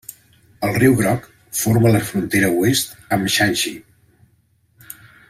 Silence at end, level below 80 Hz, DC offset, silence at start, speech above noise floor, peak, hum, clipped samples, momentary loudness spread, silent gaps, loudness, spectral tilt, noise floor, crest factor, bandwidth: 1.5 s; -50 dBFS; under 0.1%; 0.1 s; 43 dB; -2 dBFS; none; under 0.1%; 23 LU; none; -18 LUFS; -4.5 dB/octave; -60 dBFS; 18 dB; 16 kHz